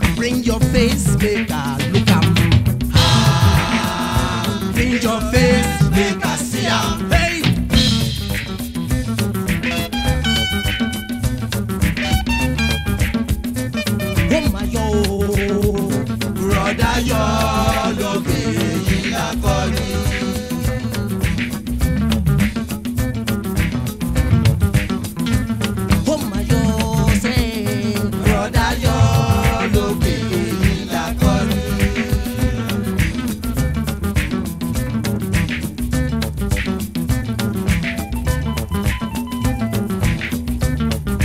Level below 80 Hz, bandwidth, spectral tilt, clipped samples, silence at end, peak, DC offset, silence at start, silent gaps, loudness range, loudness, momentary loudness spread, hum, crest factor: -26 dBFS; 16 kHz; -5.5 dB/octave; under 0.1%; 0 s; 0 dBFS; under 0.1%; 0 s; none; 5 LU; -18 LUFS; 7 LU; none; 16 dB